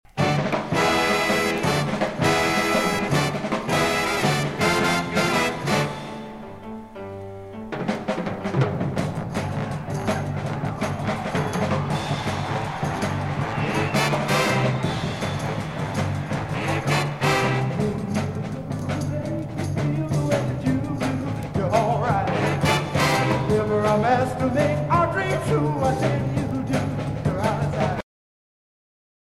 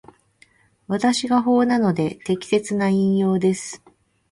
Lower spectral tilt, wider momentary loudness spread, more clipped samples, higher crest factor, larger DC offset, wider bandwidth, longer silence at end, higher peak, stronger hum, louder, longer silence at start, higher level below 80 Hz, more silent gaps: about the same, -5.5 dB/octave vs -6 dB/octave; about the same, 8 LU vs 10 LU; neither; about the same, 16 dB vs 14 dB; neither; first, 15.5 kHz vs 11.5 kHz; first, 1.2 s vs 0.55 s; about the same, -6 dBFS vs -6 dBFS; neither; second, -23 LUFS vs -20 LUFS; second, 0.15 s vs 0.9 s; first, -46 dBFS vs -60 dBFS; neither